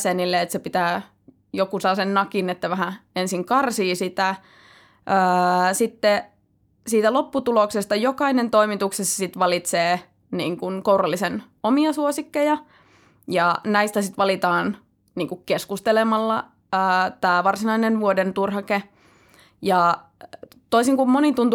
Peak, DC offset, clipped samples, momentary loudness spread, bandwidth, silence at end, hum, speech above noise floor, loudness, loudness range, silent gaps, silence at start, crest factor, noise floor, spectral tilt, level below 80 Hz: -4 dBFS; under 0.1%; under 0.1%; 8 LU; 19.5 kHz; 0 s; none; 42 dB; -21 LUFS; 2 LU; none; 0 s; 16 dB; -63 dBFS; -4.5 dB/octave; -66 dBFS